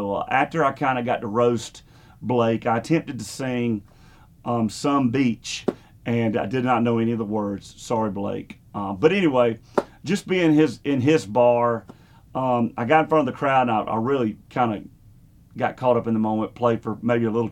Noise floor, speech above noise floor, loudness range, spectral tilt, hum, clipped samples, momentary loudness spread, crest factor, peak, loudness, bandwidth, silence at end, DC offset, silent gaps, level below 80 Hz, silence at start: -50 dBFS; 29 dB; 4 LU; -6.5 dB/octave; none; under 0.1%; 11 LU; 20 dB; -2 dBFS; -22 LUFS; 14 kHz; 0 s; under 0.1%; none; -56 dBFS; 0 s